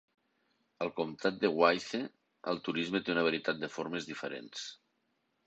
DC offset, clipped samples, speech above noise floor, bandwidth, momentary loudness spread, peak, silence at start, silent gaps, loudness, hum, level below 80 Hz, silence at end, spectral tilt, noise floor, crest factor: under 0.1%; under 0.1%; 45 dB; 8.2 kHz; 15 LU; -10 dBFS; 0.8 s; none; -34 LUFS; none; -76 dBFS; 0.75 s; -4.5 dB/octave; -79 dBFS; 24 dB